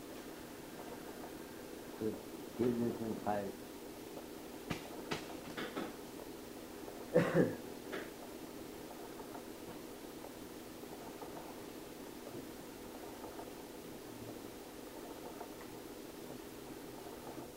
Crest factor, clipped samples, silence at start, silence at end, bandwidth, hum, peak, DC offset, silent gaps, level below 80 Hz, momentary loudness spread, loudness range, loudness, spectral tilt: 26 dB; under 0.1%; 0 s; 0 s; 16 kHz; none; -18 dBFS; under 0.1%; none; -68 dBFS; 12 LU; 10 LU; -44 LUFS; -5.5 dB/octave